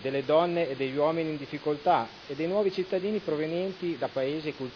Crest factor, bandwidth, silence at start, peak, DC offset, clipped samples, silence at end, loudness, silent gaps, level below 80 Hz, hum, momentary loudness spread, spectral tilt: 18 dB; 5.4 kHz; 0 s; -12 dBFS; under 0.1%; under 0.1%; 0 s; -29 LUFS; none; -66 dBFS; none; 8 LU; -7.5 dB/octave